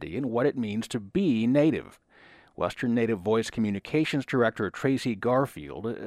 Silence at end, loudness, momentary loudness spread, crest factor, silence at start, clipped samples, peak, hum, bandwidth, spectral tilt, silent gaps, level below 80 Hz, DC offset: 0 s; -27 LUFS; 9 LU; 16 dB; 0 s; under 0.1%; -10 dBFS; none; 14 kHz; -6.5 dB/octave; none; -58 dBFS; under 0.1%